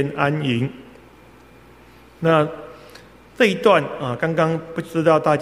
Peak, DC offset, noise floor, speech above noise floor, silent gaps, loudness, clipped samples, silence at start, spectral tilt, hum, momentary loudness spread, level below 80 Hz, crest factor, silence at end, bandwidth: 0 dBFS; under 0.1%; -47 dBFS; 28 dB; none; -20 LUFS; under 0.1%; 0 s; -6.5 dB/octave; none; 10 LU; -56 dBFS; 20 dB; 0 s; 15 kHz